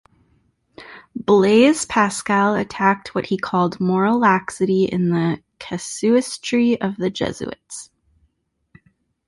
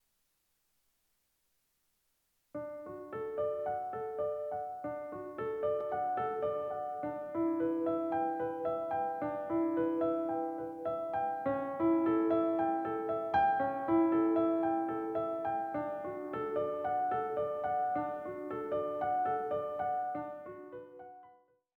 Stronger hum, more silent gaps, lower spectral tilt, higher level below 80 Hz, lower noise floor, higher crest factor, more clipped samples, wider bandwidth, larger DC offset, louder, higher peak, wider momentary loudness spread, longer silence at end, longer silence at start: neither; neither; second, -5.5 dB/octave vs -8.5 dB/octave; first, -56 dBFS vs -72 dBFS; second, -67 dBFS vs -78 dBFS; about the same, 18 dB vs 16 dB; neither; first, 11.5 kHz vs 4.3 kHz; neither; first, -19 LUFS vs -34 LUFS; first, -2 dBFS vs -18 dBFS; first, 16 LU vs 11 LU; first, 1.45 s vs 0.45 s; second, 0.8 s vs 2.55 s